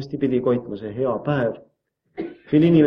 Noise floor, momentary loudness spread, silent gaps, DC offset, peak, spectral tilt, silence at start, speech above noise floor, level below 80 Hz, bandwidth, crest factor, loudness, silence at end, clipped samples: -41 dBFS; 15 LU; none; under 0.1%; -4 dBFS; -10 dB/octave; 0 s; 21 dB; -56 dBFS; 5.8 kHz; 16 dB; -22 LUFS; 0 s; under 0.1%